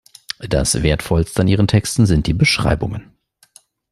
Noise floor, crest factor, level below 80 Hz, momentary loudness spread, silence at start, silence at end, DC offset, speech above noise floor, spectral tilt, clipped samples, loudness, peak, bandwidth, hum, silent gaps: -51 dBFS; 16 dB; -30 dBFS; 12 LU; 0.4 s; 0.9 s; under 0.1%; 35 dB; -5 dB/octave; under 0.1%; -16 LUFS; -2 dBFS; 13.5 kHz; none; none